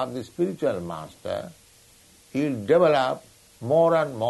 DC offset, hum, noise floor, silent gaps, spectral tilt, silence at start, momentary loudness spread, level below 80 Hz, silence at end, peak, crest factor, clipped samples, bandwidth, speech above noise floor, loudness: under 0.1%; none; -55 dBFS; none; -6.5 dB/octave; 0 s; 16 LU; -64 dBFS; 0 s; -8 dBFS; 16 dB; under 0.1%; 12 kHz; 31 dB; -24 LUFS